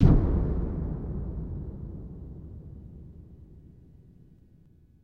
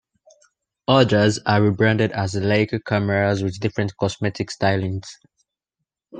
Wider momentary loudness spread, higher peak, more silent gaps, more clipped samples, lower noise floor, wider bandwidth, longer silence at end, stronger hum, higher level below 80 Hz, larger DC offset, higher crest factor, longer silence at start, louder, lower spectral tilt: first, 24 LU vs 9 LU; second, -6 dBFS vs 0 dBFS; neither; neither; second, -57 dBFS vs -82 dBFS; second, 4.7 kHz vs 9.4 kHz; first, 1.45 s vs 0 s; neither; first, -32 dBFS vs -56 dBFS; neither; about the same, 24 dB vs 20 dB; second, 0 s vs 0.9 s; second, -31 LUFS vs -20 LUFS; first, -11 dB/octave vs -6 dB/octave